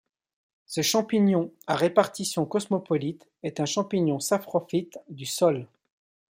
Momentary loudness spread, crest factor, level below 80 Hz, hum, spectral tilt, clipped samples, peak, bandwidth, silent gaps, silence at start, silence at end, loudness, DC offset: 12 LU; 22 dB; -72 dBFS; none; -5 dB/octave; under 0.1%; -4 dBFS; 16.5 kHz; none; 0.7 s; 0.65 s; -26 LUFS; under 0.1%